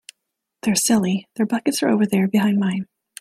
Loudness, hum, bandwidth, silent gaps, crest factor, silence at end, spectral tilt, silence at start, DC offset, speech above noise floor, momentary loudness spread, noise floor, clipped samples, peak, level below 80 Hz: -20 LUFS; none; 15.5 kHz; none; 16 dB; 0.35 s; -4.5 dB/octave; 0.65 s; under 0.1%; 60 dB; 8 LU; -79 dBFS; under 0.1%; -4 dBFS; -62 dBFS